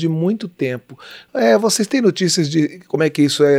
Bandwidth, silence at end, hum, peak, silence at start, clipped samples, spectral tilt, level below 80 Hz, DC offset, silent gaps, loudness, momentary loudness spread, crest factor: 16 kHz; 0 s; none; -2 dBFS; 0 s; under 0.1%; -4.5 dB/octave; -68 dBFS; under 0.1%; none; -17 LUFS; 12 LU; 14 dB